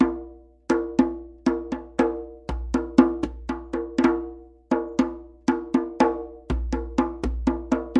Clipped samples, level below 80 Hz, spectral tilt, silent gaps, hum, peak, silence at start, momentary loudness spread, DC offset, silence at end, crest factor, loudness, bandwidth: under 0.1%; -36 dBFS; -7 dB/octave; none; none; 0 dBFS; 0 s; 12 LU; under 0.1%; 0 s; 24 dB; -25 LUFS; 9 kHz